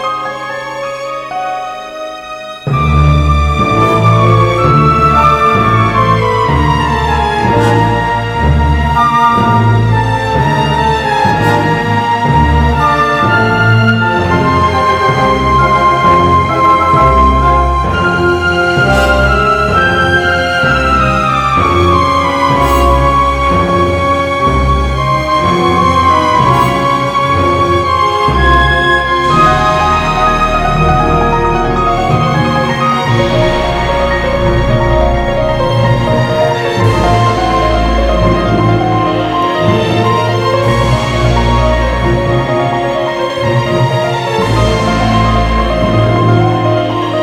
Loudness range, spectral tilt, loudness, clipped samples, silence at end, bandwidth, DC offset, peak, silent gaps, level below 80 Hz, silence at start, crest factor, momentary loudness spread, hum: 3 LU; -6.5 dB/octave; -10 LUFS; 0.3%; 0 s; 15.5 kHz; 0.3%; 0 dBFS; none; -20 dBFS; 0 s; 10 dB; 4 LU; none